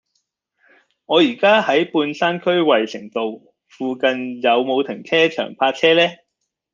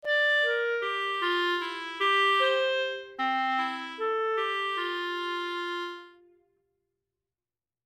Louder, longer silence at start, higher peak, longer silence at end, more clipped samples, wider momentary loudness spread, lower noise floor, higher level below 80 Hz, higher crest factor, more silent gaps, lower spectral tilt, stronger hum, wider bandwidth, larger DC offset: first, -18 LUFS vs -27 LUFS; first, 1.1 s vs 0.05 s; first, -2 dBFS vs -14 dBFS; second, 0.6 s vs 1.75 s; neither; about the same, 11 LU vs 10 LU; second, -76 dBFS vs under -90 dBFS; first, -68 dBFS vs -80 dBFS; about the same, 18 dB vs 14 dB; neither; first, -5 dB/octave vs -1 dB/octave; neither; second, 7.4 kHz vs 15.5 kHz; neither